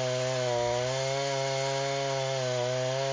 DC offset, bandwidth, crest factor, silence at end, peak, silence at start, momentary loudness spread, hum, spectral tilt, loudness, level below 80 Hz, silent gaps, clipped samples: under 0.1%; 7.6 kHz; 12 dB; 0 s; -18 dBFS; 0 s; 1 LU; none; -3.5 dB/octave; -29 LUFS; -62 dBFS; none; under 0.1%